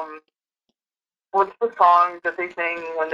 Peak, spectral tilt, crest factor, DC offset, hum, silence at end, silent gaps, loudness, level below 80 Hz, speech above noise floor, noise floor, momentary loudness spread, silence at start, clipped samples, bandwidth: -4 dBFS; -4.5 dB/octave; 20 dB; under 0.1%; none; 0 s; none; -20 LUFS; -70 dBFS; over 70 dB; under -90 dBFS; 11 LU; 0 s; under 0.1%; 7.4 kHz